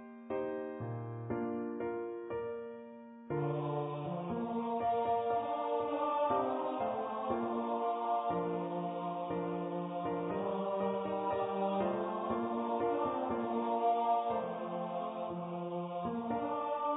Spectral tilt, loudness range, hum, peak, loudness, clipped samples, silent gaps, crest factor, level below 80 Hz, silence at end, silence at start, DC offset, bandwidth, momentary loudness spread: -4.5 dB/octave; 5 LU; none; -20 dBFS; -36 LUFS; under 0.1%; none; 14 dB; -68 dBFS; 0 s; 0 s; under 0.1%; 3.9 kHz; 8 LU